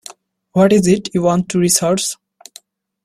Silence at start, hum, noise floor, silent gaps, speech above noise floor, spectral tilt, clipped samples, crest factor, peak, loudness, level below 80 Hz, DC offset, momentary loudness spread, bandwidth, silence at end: 0.55 s; none; -46 dBFS; none; 32 dB; -5 dB/octave; under 0.1%; 16 dB; 0 dBFS; -15 LUFS; -52 dBFS; under 0.1%; 10 LU; 14 kHz; 0.9 s